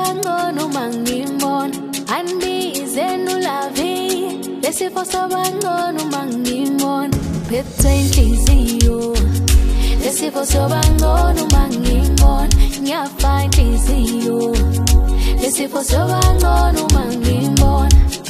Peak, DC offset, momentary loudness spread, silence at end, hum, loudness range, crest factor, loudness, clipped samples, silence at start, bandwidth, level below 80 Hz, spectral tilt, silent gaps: 0 dBFS; under 0.1%; 7 LU; 0 s; none; 5 LU; 14 dB; -16 LUFS; under 0.1%; 0 s; 15.5 kHz; -16 dBFS; -5 dB/octave; none